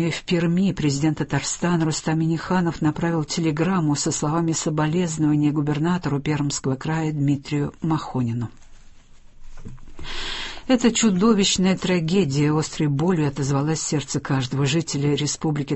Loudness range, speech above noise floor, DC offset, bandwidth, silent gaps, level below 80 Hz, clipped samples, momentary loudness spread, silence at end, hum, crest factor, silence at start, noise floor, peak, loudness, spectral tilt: 6 LU; 23 dB; under 0.1%; 8.6 kHz; none; -46 dBFS; under 0.1%; 7 LU; 0 s; none; 18 dB; 0 s; -45 dBFS; -4 dBFS; -22 LUFS; -5 dB/octave